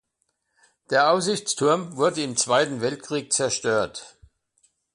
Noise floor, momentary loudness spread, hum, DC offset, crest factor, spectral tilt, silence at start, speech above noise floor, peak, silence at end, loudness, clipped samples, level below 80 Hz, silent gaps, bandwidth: -75 dBFS; 8 LU; none; under 0.1%; 20 dB; -3 dB/octave; 0.9 s; 52 dB; -6 dBFS; 0.85 s; -23 LUFS; under 0.1%; -64 dBFS; none; 11.5 kHz